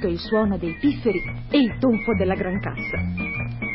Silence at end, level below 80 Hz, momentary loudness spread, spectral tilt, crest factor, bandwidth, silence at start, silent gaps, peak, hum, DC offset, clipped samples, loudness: 0 s; -38 dBFS; 6 LU; -11.5 dB/octave; 16 dB; 5.8 kHz; 0 s; none; -6 dBFS; none; under 0.1%; under 0.1%; -23 LUFS